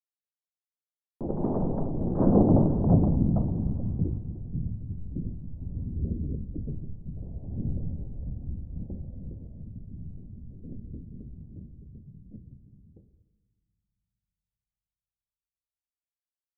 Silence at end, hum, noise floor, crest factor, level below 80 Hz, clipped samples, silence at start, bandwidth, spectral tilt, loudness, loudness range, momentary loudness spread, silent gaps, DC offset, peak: 4 s; none; under -90 dBFS; 24 dB; -38 dBFS; under 0.1%; 1.2 s; 1.8 kHz; -13.5 dB/octave; -29 LUFS; 21 LU; 23 LU; none; under 0.1%; -6 dBFS